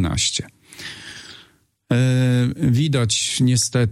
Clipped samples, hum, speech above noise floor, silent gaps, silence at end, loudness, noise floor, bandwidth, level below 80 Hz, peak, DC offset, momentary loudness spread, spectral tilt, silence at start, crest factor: under 0.1%; none; 36 dB; none; 0 s; -19 LUFS; -54 dBFS; 13 kHz; -44 dBFS; -6 dBFS; under 0.1%; 18 LU; -4.5 dB/octave; 0 s; 14 dB